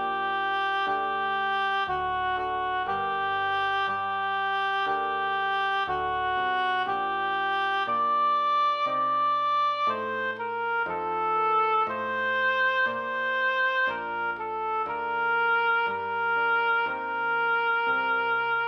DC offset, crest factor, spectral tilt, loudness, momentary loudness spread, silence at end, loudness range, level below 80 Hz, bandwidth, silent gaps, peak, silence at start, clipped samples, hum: under 0.1%; 12 dB; -4 dB/octave; -26 LUFS; 5 LU; 0 s; 2 LU; -60 dBFS; 10 kHz; none; -14 dBFS; 0 s; under 0.1%; none